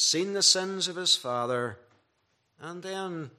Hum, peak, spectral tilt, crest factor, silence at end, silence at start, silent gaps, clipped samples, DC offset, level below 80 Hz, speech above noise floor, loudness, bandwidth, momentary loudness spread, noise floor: none; -8 dBFS; -1.5 dB/octave; 22 dB; 0.1 s; 0 s; none; under 0.1%; under 0.1%; -82 dBFS; 45 dB; -26 LUFS; 14.5 kHz; 18 LU; -74 dBFS